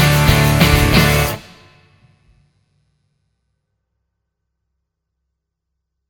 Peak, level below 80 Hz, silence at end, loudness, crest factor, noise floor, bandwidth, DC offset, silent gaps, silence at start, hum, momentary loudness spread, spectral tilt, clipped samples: 0 dBFS; -28 dBFS; 4.7 s; -13 LUFS; 18 dB; -77 dBFS; 19 kHz; under 0.1%; none; 0 s; none; 8 LU; -5 dB/octave; under 0.1%